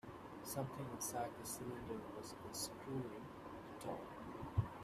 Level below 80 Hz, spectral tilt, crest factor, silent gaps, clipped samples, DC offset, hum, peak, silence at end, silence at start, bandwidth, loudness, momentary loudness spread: -66 dBFS; -4.5 dB/octave; 22 dB; none; under 0.1%; under 0.1%; none; -26 dBFS; 0 s; 0.05 s; 15.5 kHz; -47 LUFS; 9 LU